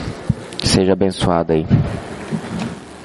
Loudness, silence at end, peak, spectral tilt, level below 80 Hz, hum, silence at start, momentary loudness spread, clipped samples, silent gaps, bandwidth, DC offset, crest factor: -18 LUFS; 0 s; -2 dBFS; -5.5 dB/octave; -36 dBFS; none; 0 s; 11 LU; under 0.1%; none; 11.5 kHz; under 0.1%; 16 dB